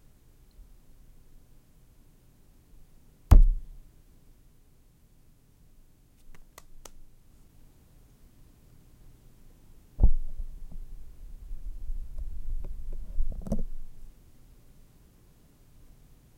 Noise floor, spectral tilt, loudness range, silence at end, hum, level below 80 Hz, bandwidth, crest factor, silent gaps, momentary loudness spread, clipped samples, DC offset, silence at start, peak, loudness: -58 dBFS; -8 dB/octave; 12 LU; 2.3 s; none; -32 dBFS; 7.2 kHz; 24 dB; none; 31 LU; under 0.1%; under 0.1%; 3.3 s; -6 dBFS; -31 LUFS